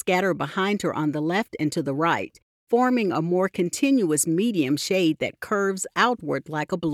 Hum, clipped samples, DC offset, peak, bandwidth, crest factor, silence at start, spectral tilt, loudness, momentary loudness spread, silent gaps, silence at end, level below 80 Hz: none; under 0.1%; under 0.1%; -6 dBFS; 16 kHz; 18 dB; 0.05 s; -4.5 dB/octave; -24 LUFS; 6 LU; 2.42-2.67 s; 0 s; -66 dBFS